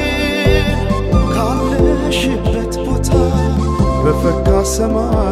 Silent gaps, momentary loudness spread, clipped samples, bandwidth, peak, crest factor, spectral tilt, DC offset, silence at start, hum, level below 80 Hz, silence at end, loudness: none; 4 LU; under 0.1%; 15 kHz; -2 dBFS; 12 dB; -6 dB/octave; under 0.1%; 0 s; none; -20 dBFS; 0 s; -15 LUFS